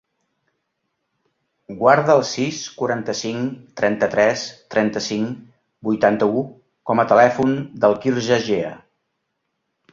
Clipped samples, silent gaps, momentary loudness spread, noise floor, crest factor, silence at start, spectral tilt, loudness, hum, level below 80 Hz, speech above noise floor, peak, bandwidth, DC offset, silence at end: under 0.1%; none; 13 LU; -75 dBFS; 18 dB; 1.7 s; -5 dB/octave; -19 LUFS; none; -60 dBFS; 56 dB; -2 dBFS; 7.6 kHz; under 0.1%; 1.15 s